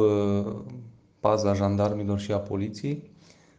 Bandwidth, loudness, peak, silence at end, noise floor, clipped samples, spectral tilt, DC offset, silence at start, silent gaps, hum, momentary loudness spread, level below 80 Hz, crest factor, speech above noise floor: 8 kHz; -27 LUFS; -8 dBFS; 0.5 s; -46 dBFS; under 0.1%; -7.5 dB/octave; under 0.1%; 0 s; none; none; 13 LU; -62 dBFS; 20 dB; 21 dB